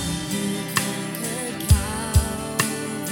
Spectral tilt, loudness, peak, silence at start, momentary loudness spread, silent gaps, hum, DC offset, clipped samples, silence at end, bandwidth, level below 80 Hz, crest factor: -4 dB/octave; -24 LUFS; -4 dBFS; 0 s; 6 LU; none; none; under 0.1%; under 0.1%; 0 s; 18 kHz; -32 dBFS; 20 dB